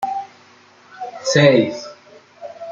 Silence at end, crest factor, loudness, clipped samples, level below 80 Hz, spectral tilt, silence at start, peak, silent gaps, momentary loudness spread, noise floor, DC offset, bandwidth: 0 s; 18 dB; -16 LUFS; under 0.1%; -62 dBFS; -5 dB/octave; 0 s; -2 dBFS; none; 25 LU; -49 dBFS; under 0.1%; 7.6 kHz